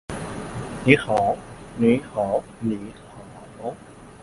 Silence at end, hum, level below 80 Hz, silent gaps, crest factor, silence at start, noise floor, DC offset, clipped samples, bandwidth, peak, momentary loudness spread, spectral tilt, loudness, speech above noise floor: 0 s; none; -48 dBFS; none; 24 dB; 0.1 s; -42 dBFS; under 0.1%; under 0.1%; 11.5 kHz; 0 dBFS; 24 LU; -6.5 dB/octave; -23 LUFS; 20 dB